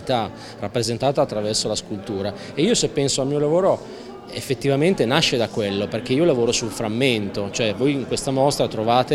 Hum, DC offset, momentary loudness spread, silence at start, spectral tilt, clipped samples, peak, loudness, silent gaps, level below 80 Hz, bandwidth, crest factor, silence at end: none; under 0.1%; 9 LU; 0 s; -4.5 dB/octave; under 0.1%; 0 dBFS; -21 LUFS; none; -50 dBFS; 15.5 kHz; 20 dB; 0 s